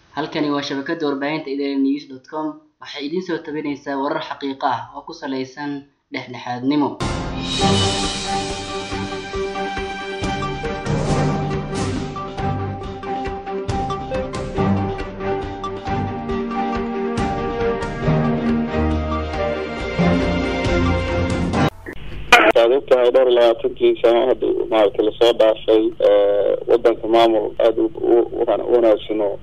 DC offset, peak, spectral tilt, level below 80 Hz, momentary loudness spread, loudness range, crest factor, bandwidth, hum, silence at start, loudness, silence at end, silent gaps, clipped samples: under 0.1%; 0 dBFS; -5.5 dB/octave; -36 dBFS; 12 LU; 9 LU; 20 dB; 13.5 kHz; none; 0.15 s; -19 LUFS; 0 s; none; under 0.1%